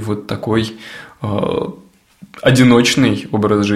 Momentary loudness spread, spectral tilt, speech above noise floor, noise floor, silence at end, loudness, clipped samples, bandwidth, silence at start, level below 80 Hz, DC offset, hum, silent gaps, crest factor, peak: 17 LU; -5.5 dB/octave; 28 dB; -43 dBFS; 0 s; -15 LUFS; under 0.1%; 15 kHz; 0 s; -46 dBFS; under 0.1%; none; none; 16 dB; 0 dBFS